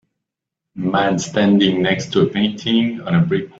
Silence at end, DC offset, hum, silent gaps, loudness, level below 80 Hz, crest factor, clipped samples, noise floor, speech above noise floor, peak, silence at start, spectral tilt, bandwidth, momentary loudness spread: 0.1 s; under 0.1%; none; none; -17 LUFS; -54 dBFS; 16 dB; under 0.1%; -83 dBFS; 66 dB; -2 dBFS; 0.75 s; -5.5 dB/octave; 8 kHz; 5 LU